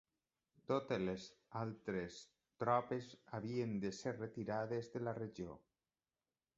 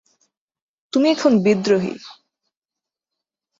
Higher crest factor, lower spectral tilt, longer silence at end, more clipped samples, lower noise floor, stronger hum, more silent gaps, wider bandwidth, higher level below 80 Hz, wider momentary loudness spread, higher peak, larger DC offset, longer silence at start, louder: about the same, 22 dB vs 18 dB; about the same, -6 dB/octave vs -6 dB/octave; second, 1 s vs 1.45 s; neither; about the same, under -90 dBFS vs -87 dBFS; neither; neither; about the same, 7.6 kHz vs 7.8 kHz; second, -74 dBFS vs -66 dBFS; about the same, 13 LU vs 11 LU; second, -22 dBFS vs -4 dBFS; neither; second, 0.7 s vs 0.95 s; second, -43 LUFS vs -18 LUFS